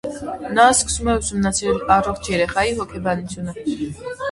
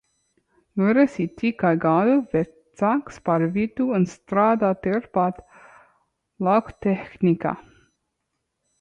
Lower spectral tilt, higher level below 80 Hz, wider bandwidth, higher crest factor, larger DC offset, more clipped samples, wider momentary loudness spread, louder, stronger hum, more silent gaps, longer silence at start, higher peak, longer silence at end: second, -3.5 dB/octave vs -8.5 dB/octave; first, -38 dBFS vs -58 dBFS; first, 11.5 kHz vs 8.4 kHz; about the same, 20 dB vs 16 dB; neither; neither; first, 14 LU vs 7 LU; about the same, -20 LUFS vs -22 LUFS; neither; neither; second, 0.05 s vs 0.75 s; first, 0 dBFS vs -8 dBFS; second, 0 s vs 1.2 s